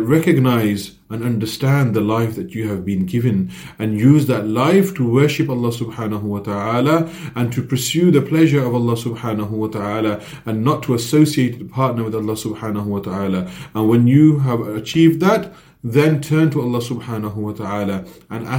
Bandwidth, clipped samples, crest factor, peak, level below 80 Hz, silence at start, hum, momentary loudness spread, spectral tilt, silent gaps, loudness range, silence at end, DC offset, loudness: 17 kHz; under 0.1%; 16 dB; 0 dBFS; -52 dBFS; 0 s; none; 11 LU; -7 dB/octave; none; 3 LU; 0 s; under 0.1%; -18 LUFS